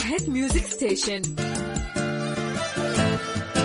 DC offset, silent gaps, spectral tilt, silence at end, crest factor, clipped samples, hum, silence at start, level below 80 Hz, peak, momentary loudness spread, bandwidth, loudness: under 0.1%; none; -4 dB/octave; 0 s; 16 dB; under 0.1%; none; 0 s; -36 dBFS; -10 dBFS; 4 LU; 11 kHz; -26 LUFS